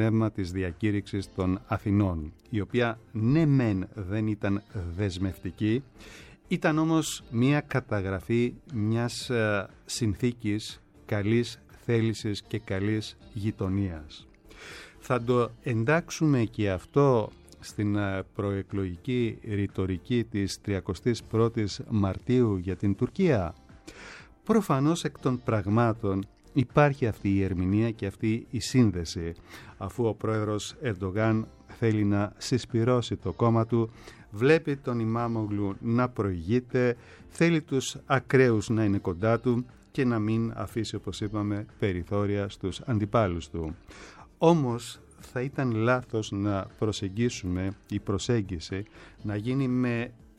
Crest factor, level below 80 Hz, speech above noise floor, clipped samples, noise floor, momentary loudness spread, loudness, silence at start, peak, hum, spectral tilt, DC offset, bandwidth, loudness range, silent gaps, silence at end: 20 dB; -52 dBFS; 20 dB; under 0.1%; -47 dBFS; 12 LU; -28 LUFS; 0 s; -8 dBFS; none; -6.5 dB/octave; under 0.1%; 14 kHz; 4 LU; none; 0.25 s